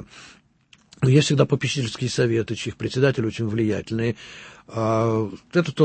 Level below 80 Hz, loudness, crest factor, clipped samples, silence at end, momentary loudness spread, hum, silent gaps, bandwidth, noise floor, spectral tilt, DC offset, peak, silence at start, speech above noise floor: -54 dBFS; -22 LUFS; 20 dB; under 0.1%; 0 s; 11 LU; none; none; 8.8 kHz; -57 dBFS; -6 dB/octave; under 0.1%; -4 dBFS; 0 s; 35 dB